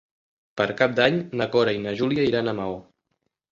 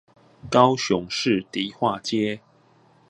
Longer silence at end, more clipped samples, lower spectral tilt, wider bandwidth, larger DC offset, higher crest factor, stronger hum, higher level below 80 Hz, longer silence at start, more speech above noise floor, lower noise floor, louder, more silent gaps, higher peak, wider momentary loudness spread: about the same, 0.7 s vs 0.7 s; neither; first, -6.5 dB/octave vs -5 dB/octave; second, 7.6 kHz vs 11 kHz; neither; about the same, 22 dB vs 24 dB; neither; about the same, -58 dBFS vs -60 dBFS; about the same, 0.55 s vs 0.45 s; first, 54 dB vs 35 dB; first, -77 dBFS vs -57 dBFS; about the same, -23 LUFS vs -23 LUFS; neither; about the same, -2 dBFS vs 0 dBFS; about the same, 11 LU vs 10 LU